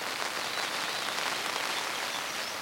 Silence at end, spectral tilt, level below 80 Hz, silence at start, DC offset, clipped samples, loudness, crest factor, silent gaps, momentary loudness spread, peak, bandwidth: 0 s; 0 dB/octave; -74 dBFS; 0 s; under 0.1%; under 0.1%; -31 LUFS; 22 dB; none; 2 LU; -12 dBFS; 17 kHz